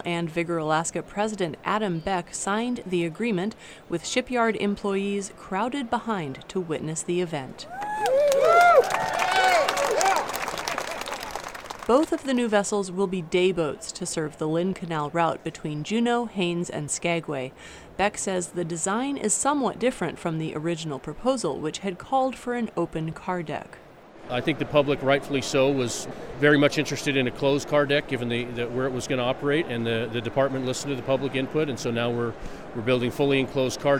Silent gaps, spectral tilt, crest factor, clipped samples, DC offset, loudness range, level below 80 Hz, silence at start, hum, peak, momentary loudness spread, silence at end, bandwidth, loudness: none; -4.5 dB/octave; 22 dB; under 0.1%; under 0.1%; 6 LU; -54 dBFS; 0 s; none; -4 dBFS; 10 LU; 0 s; 16 kHz; -25 LUFS